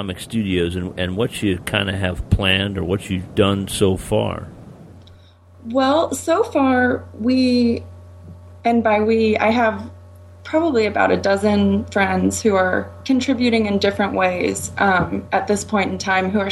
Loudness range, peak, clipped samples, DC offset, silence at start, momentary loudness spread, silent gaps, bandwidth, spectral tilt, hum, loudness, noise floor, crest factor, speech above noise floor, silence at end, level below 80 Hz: 3 LU; -2 dBFS; under 0.1%; under 0.1%; 0 s; 7 LU; none; 15 kHz; -5 dB/octave; none; -19 LUFS; -46 dBFS; 18 dB; 28 dB; 0 s; -40 dBFS